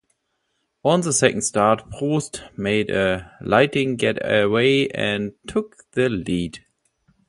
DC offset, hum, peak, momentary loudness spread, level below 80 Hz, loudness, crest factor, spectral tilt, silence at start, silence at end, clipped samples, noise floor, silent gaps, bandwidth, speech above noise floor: under 0.1%; none; 0 dBFS; 10 LU; -50 dBFS; -21 LUFS; 20 dB; -4.5 dB/octave; 0.85 s; 0.7 s; under 0.1%; -73 dBFS; none; 11.5 kHz; 52 dB